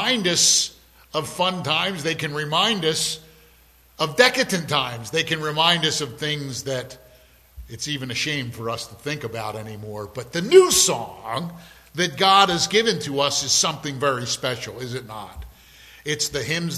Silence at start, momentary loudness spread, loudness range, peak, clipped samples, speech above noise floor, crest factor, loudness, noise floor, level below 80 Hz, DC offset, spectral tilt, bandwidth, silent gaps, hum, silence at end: 0 s; 17 LU; 9 LU; 0 dBFS; under 0.1%; 32 dB; 22 dB; -21 LUFS; -54 dBFS; -52 dBFS; under 0.1%; -2.5 dB/octave; 15 kHz; none; none; 0 s